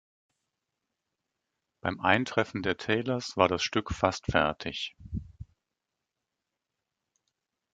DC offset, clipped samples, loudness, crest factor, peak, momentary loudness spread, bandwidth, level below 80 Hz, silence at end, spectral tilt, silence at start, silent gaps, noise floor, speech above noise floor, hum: under 0.1%; under 0.1%; -29 LUFS; 26 dB; -6 dBFS; 11 LU; 9.2 kHz; -50 dBFS; 2.3 s; -4.5 dB/octave; 1.85 s; none; -86 dBFS; 58 dB; none